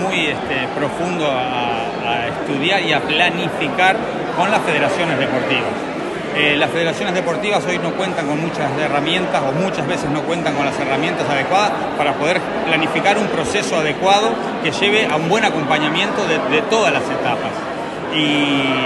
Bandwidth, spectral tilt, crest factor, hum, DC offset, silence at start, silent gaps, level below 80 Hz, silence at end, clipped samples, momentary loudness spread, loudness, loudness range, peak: 11.5 kHz; -4.5 dB/octave; 18 dB; none; under 0.1%; 0 s; none; -50 dBFS; 0 s; under 0.1%; 6 LU; -17 LUFS; 2 LU; 0 dBFS